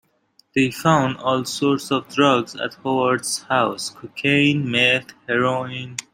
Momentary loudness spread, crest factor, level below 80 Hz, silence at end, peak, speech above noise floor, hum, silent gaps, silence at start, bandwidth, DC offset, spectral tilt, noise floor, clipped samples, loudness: 10 LU; 18 dB; -62 dBFS; 0.15 s; -2 dBFS; 40 dB; none; none; 0.55 s; 16 kHz; under 0.1%; -4.5 dB/octave; -60 dBFS; under 0.1%; -20 LUFS